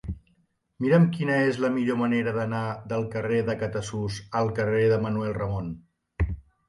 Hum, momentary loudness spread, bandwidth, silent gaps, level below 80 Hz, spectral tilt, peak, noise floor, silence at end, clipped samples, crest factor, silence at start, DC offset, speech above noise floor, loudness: none; 10 LU; 11.5 kHz; none; -42 dBFS; -7.5 dB/octave; -8 dBFS; -68 dBFS; 0.3 s; under 0.1%; 16 dB; 0.05 s; under 0.1%; 43 dB; -26 LUFS